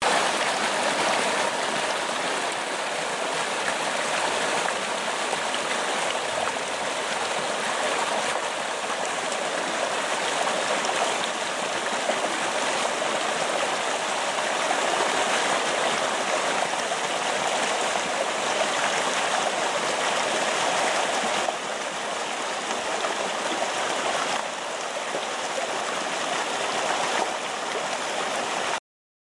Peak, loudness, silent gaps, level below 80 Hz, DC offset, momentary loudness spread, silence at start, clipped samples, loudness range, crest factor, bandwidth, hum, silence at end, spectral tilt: -10 dBFS; -25 LUFS; none; -72 dBFS; under 0.1%; 4 LU; 0 s; under 0.1%; 3 LU; 16 dB; 11.5 kHz; none; 0.4 s; -1 dB/octave